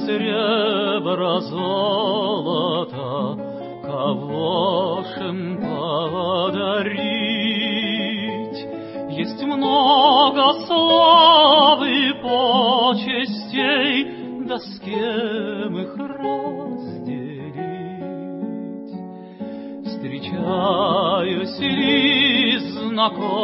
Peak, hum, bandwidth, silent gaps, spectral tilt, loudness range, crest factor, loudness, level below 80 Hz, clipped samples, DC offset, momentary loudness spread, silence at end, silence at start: -2 dBFS; none; 5.8 kHz; none; -9.5 dB/octave; 14 LU; 18 dB; -19 LUFS; -64 dBFS; under 0.1%; under 0.1%; 17 LU; 0 s; 0 s